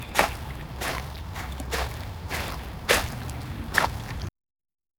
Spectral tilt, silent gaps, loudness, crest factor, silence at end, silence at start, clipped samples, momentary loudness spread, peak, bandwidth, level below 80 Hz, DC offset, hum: -3.5 dB/octave; none; -29 LUFS; 30 dB; 0.7 s; 0 s; under 0.1%; 13 LU; 0 dBFS; over 20 kHz; -38 dBFS; under 0.1%; none